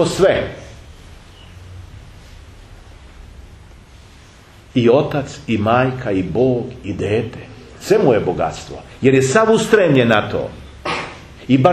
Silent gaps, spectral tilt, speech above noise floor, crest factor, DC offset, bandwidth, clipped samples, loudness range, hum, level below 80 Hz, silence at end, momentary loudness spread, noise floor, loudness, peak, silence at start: none; -6 dB/octave; 27 dB; 18 dB; under 0.1%; 13.5 kHz; under 0.1%; 7 LU; none; -42 dBFS; 0 s; 22 LU; -43 dBFS; -16 LUFS; 0 dBFS; 0 s